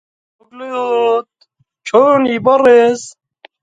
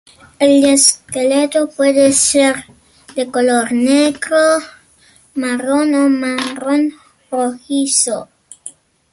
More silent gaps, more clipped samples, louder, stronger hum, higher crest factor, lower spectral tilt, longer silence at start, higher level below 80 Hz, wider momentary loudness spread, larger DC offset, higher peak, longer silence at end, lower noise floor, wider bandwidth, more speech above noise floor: neither; neither; about the same, -12 LUFS vs -14 LUFS; neither; about the same, 14 dB vs 14 dB; first, -4.5 dB/octave vs -2 dB/octave; first, 0.55 s vs 0.4 s; about the same, -60 dBFS vs -56 dBFS; first, 19 LU vs 14 LU; neither; about the same, 0 dBFS vs 0 dBFS; about the same, 0.5 s vs 0.4 s; first, -58 dBFS vs -50 dBFS; second, 9.2 kHz vs 12 kHz; first, 48 dB vs 36 dB